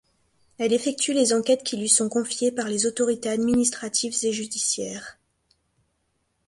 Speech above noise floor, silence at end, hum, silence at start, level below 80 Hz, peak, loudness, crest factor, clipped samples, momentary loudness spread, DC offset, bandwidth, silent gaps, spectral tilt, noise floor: 49 dB; 1.35 s; none; 0.6 s; -62 dBFS; -4 dBFS; -23 LUFS; 20 dB; under 0.1%; 7 LU; under 0.1%; 11.5 kHz; none; -2.5 dB/octave; -73 dBFS